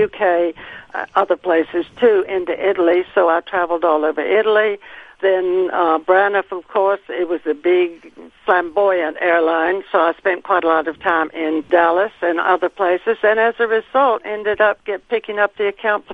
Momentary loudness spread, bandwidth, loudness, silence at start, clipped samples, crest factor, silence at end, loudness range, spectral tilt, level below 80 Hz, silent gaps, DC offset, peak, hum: 7 LU; 4.8 kHz; -17 LUFS; 0 s; under 0.1%; 16 dB; 0 s; 1 LU; -6.5 dB/octave; -58 dBFS; none; under 0.1%; 0 dBFS; none